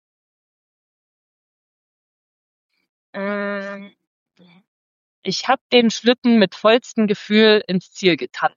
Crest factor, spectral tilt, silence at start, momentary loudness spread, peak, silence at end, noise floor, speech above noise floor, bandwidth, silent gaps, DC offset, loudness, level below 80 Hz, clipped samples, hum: 20 dB; -4.5 dB/octave; 3.15 s; 14 LU; -2 dBFS; 0.1 s; under -90 dBFS; over 72 dB; 7.4 kHz; 4.07-4.26 s, 4.67-5.23 s, 5.61-5.70 s, 6.18-6.22 s; under 0.1%; -18 LUFS; -76 dBFS; under 0.1%; none